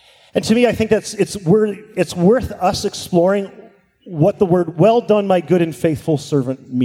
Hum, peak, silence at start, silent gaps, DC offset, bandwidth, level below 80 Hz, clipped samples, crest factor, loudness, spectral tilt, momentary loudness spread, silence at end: none; -2 dBFS; 0.35 s; none; under 0.1%; 16 kHz; -46 dBFS; under 0.1%; 16 dB; -17 LUFS; -6.5 dB/octave; 8 LU; 0 s